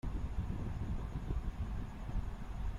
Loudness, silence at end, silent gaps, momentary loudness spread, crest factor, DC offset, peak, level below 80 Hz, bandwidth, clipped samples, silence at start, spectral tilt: -43 LUFS; 0 s; none; 3 LU; 14 dB; under 0.1%; -24 dBFS; -40 dBFS; 11 kHz; under 0.1%; 0.05 s; -8 dB/octave